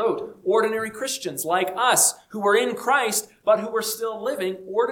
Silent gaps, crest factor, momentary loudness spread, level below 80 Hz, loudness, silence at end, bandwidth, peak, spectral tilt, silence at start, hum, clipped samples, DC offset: none; 18 dB; 9 LU; -70 dBFS; -22 LUFS; 0 s; 19 kHz; -4 dBFS; -1.5 dB/octave; 0 s; none; under 0.1%; under 0.1%